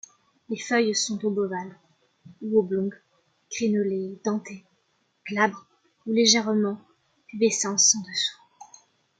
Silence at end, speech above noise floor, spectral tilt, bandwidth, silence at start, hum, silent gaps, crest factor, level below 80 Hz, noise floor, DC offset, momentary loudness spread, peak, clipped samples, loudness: 0.55 s; 46 dB; -2.5 dB/octave; 10 kHz; 0.5 s; none; none; 22 dB; -74 dBFS; -70 dBFS; under 0.1%; 21 LU; -6 dBFS; under 0.1%; -24 LUFS